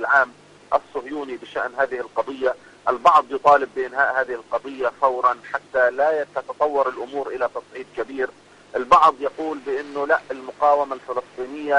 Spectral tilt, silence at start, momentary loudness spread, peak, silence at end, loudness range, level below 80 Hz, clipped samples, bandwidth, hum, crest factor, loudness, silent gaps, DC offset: -4 dB/octave; 0 s; 13 LU; -4 dBFS; 0 s; 3 LU; -60 dBFS; under 0.1%; 10.5 kHz; 50 Hz at -60 dBFS; 18 dB; -21 LUFS; none; under 0.1%